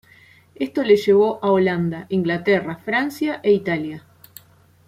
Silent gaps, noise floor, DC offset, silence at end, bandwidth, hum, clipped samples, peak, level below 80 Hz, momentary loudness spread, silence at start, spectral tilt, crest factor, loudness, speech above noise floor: none; -53 dBFS; under 0.1%; 0.9 s; 15 kHz; none; under 0.1%; -2 dBFS; -62 dBFS; 10 LU; 0.6 s; -7 dB/octave; 18 dB; -20 LUFS; 33 dB